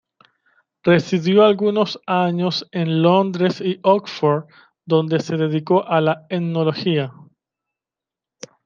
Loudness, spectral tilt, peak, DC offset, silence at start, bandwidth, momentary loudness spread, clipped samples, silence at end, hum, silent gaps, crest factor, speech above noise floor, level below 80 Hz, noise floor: -19 LUFS; -7 dB/octave; -2 dBFS; under 0.1%; 0.85 s; 7.4 kHz; 7 LU; under 0.1%; 1.45 s; none; none; 18 dB; 70 dB; -66 dBFS; -88 dBFS